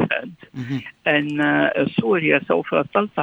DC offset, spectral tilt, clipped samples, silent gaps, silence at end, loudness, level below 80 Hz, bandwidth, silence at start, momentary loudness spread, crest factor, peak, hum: under 0.1%; -7.5 dB/octave; under 0.1%; none; 0 s; -20 LUFS; -62 dBFS; 7.8 kHz; 0 s; 11 LU; 18 dB; -2 dBFS; none